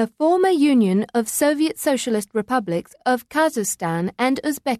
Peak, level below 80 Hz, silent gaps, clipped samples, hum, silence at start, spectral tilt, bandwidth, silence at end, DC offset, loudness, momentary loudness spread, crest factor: -8 dBFS; -62 dBFS; none; under 0.1%; none; 0 s; -4.5 dB/octave; 14.5 kHz; 0 s; under 0.1%; -20 LUFS; 7 LU; 12 dB